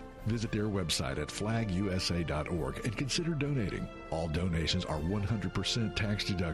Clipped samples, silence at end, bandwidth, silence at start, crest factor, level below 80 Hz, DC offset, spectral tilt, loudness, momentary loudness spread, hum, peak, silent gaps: under 0.1%; 0 s; 13.5 kHz; 0 s; 14 dB; -46 dBFS; under 0.1%; -5 dB/octave; -33 LUFS; 4 LU; none; -18 dBFS; none